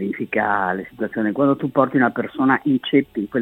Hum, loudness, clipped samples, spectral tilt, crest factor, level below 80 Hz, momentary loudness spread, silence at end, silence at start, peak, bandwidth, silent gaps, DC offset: none; -20 LUFS; under 0.1%; -8.5 dB/octave; 18 dB; -60 dBFS; 7 LU; 0 s; 0 s; -2 dBFS; 4 kHz; none; under 0.1%